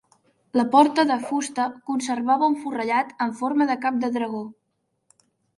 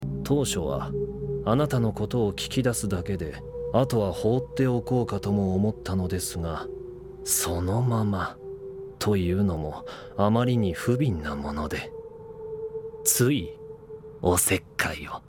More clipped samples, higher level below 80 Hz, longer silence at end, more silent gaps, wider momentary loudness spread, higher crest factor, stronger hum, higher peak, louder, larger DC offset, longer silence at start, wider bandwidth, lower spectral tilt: neither; second, -74 dBFS vs -44 dBFS; first, 1.05 s vs 0.1 s; neither; second, 10 LU vs 15 LU; about the same, 20 dB vs 20 dB; neither; first, -2 dBFS vs -6 dBFS; first, -23 LUFS vs -26 LUFS; neither; first, 0.55 s vs 0 s; second, 11.5 kHz vs 19 kHz; about the same, -4 dB/octave vs -5 dB/octave